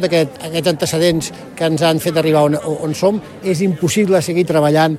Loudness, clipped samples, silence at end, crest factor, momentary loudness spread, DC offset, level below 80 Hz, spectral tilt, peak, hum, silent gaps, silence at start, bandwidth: -16 LUFS; under 0.1%; 0 s; 14 dB; 7 LU; under 0.1%; -50 dBFS; -5.5 dB/octave; -2 dBFS; none; none; 0 s; 15.5 kHz